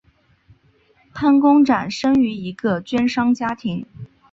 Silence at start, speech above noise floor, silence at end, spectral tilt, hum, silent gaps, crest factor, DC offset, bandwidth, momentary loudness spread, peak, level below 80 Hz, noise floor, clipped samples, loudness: 1.15 s; 40 dB; 0.25 s; -6 dB/octave; none; none; 16 dB; under 0.1%; 7.6 kHz; 14 LU; -4 dBFS; -54 dBFS; -57 dBFS; under 0.1%; -18 LUFS